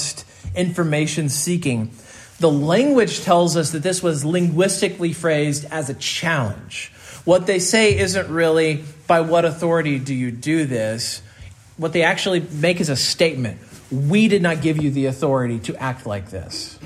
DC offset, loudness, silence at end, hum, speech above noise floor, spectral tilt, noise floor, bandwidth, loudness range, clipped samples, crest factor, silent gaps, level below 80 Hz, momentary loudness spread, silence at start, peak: under 0.1%; -19 LUFS; 0 s; none; 23 dB; -4.5 dB/octave; -42 dBFS; 15 kHz; 3 LU; under 0.1%; 16 dB; none; -50 dBFS; 12 LU; 0 s; -2 dBFS